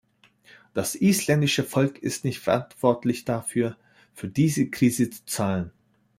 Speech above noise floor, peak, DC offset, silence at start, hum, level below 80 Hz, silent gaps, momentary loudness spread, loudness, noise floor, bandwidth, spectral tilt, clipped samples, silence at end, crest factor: 33 dB; -6 dBFS; under 0.1%; 0.75 s; none; -62 dBFS; none; 9 LU; -25 LUFS; -57 dBFS; 16 kHz; -5 dB/octave; under 0.1%; 0.5 s; 20 dB